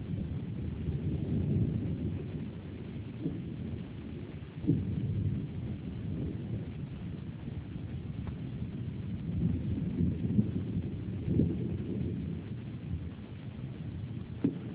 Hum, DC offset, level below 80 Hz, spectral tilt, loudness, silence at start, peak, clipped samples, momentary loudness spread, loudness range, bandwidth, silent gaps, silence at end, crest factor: none; under 0.1%; -46 dBFS; -9.5 dB/octave; -36 LUFS; 0 s; -14 dBFS; under 0.1%; 11 LU; 5 LU; 4 kHz; none; 0 s; 20 dB